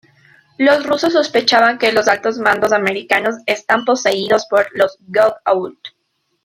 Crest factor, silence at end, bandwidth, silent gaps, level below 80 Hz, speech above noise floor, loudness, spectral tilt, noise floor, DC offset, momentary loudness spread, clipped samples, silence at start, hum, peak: 14 dB; 0.55 s; 16 kHz; none; -60 dBFS; 53 dB; -15 LUFS; -3 dB/octave; -68 dBFS; under 0.1%; 5 LU; under 0.1%; 0.6 s; none; 0 dBFS